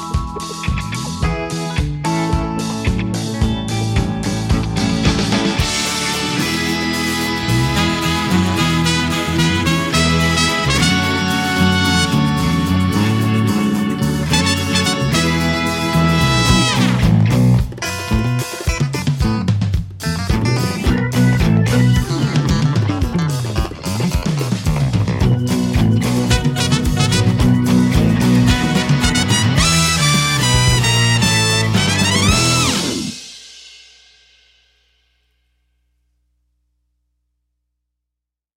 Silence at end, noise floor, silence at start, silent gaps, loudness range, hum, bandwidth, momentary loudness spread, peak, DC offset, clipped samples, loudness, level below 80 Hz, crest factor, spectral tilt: 4.85 s; -83 dBFS; 0 s; none; 5 LU; 60 Hz at -40 dBFS; 16.5 kHz; 8 LU; 0 dBFS; under 0.1%; under 0.1%; -16 LUFS; -28 dBFS; 16 dB; -4.5 dB/octave